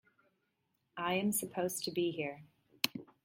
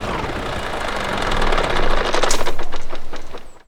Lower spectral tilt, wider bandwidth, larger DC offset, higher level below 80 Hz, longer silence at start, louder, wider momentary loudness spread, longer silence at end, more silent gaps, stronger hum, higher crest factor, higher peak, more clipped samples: about the same, -3.5 dB/octave vs -3.5 dB/octave; first, 16.5 kHz vs 11.5 kHz; neither; second, -78 dBFS vs -22 dBFS; first, 0.95 s vs 0 s; second, -36 LUFS vs -22 LUFS; second, 9 LU vs 14 LU; about the same, 0.2 s vs 0.1 s; neither; neither; first, 30 dB vs 16 dB; second, -8 dBFS vs 0 dBFS; neither